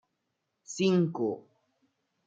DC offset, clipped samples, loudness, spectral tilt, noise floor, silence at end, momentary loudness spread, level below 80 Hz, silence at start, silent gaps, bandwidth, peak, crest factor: under 0.1%; under 0.1%; -29 LUFS; -6 dB/octave; -82 dBFS; 0.85 s; 17 LU; -78 dBFS; 0.7 s; none; 9 kHz; -14 dBFS; 18 dB